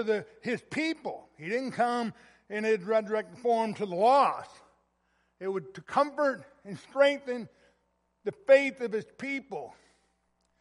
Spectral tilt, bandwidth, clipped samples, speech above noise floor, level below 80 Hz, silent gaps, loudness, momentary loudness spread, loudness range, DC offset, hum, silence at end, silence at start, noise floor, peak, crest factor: -5 dB/octave; 11.5 kHz; under 0.1%; 46 dB; -76 dBFS; none; -29 LUFS; 17 LU; 3 LU; under 0.1%; none; 0.9 s; 0 s; -75 dBFS; -10 dBFS; 20 dB